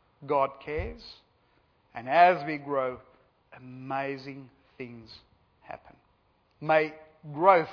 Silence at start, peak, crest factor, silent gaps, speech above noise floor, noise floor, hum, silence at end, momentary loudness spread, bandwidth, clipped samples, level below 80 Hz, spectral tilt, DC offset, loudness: 0.2 s; -6 dBFS; 24 dB; none; 40 dB; -68 dBFS; none; 0 s; 25 LU; 5.4 kHz; under 0.1%; -54 dBFS; -7.5 dB/octave; under 0.1%; -27 LUFS